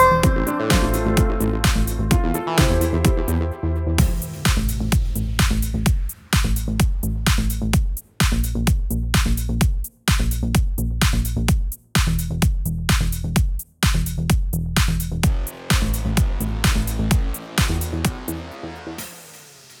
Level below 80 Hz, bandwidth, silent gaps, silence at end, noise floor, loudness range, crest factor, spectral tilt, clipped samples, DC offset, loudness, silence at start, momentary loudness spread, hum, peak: -22 dBFS; 18.5 kHz; none; 0.05 s; -44 dBFS; 2 LU; 18 dB; -5 dB/octave; under 0.1%; under 0.1%; -21 LUFS; 0 s; 5 LU; none; -2 dBFS